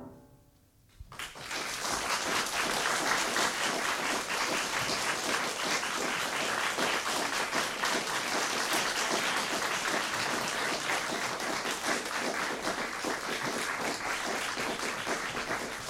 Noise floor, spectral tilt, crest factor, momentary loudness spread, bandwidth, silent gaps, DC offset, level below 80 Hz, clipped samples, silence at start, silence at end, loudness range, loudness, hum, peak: -63 dBFS; -1 dB/octave; 18 dB; 5 LU; 17 kHz; none; under 0.1%; -62 dBFS; under 0.1%; 0 s; 0 s; 3 LU; -31 LUFS; none; -14 dBFS